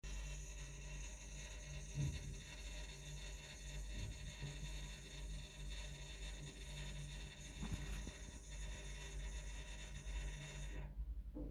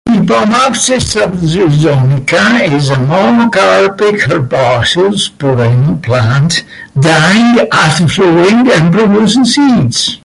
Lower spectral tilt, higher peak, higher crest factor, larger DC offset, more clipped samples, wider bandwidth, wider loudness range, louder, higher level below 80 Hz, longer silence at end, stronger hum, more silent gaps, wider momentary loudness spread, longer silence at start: about the same, -4 dB/octave vs -5 dB/octave; second, -30 dBFS vs 0 dBFS; first, 18 dB vs 8 dB; neither; neither; first, 13 kHz vs 11.5 kHz; about the same, 1 LU vs 2 LU; second, -51 LUFS vs -9 LUFS; second, -50 dBFS vs -36 dBFS; about the same, 0 s vs 0.05 s; neither; neither; about the same, 4 LU vs 5 LU; about the same, 0.05 s vs 0.05 s